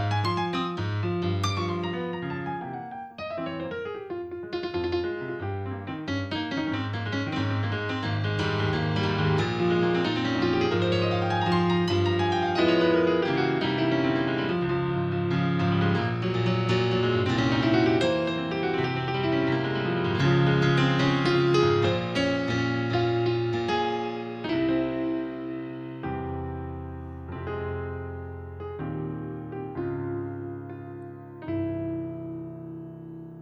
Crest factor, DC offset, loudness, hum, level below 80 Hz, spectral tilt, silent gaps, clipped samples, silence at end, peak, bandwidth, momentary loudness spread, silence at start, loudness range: 16 dB; under 0.1%; -27 LUFS; none; -52 dBFS; -7 dB/octave; none; under 0.1%; 0 s; -10 dBFS; 8.8 kHz; 14 LU; 0 s; 11 LU